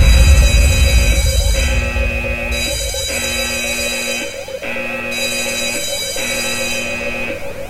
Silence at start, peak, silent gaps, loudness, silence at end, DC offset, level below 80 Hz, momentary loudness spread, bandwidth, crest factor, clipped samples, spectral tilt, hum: 0 s; 0 dBFS; none; -16 LUFS; 0 s; under 0.1%; -18 dBFS; 9 LU; 16 kHz; 14 dB; under 0.1%; -3.5 dB/octave; none